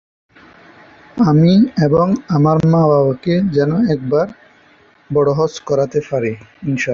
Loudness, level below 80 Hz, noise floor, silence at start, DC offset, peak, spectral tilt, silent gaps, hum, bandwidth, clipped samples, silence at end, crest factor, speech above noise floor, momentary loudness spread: -15 LUFS; -48 dBFS; -49 dBFS; 1.15 s; under 0.1%; -2 dBFS; -8 dB/octave; none; none; 7.2 kHz; under 0.1%; 0 s; 14 dB; 36 dB; 9 LU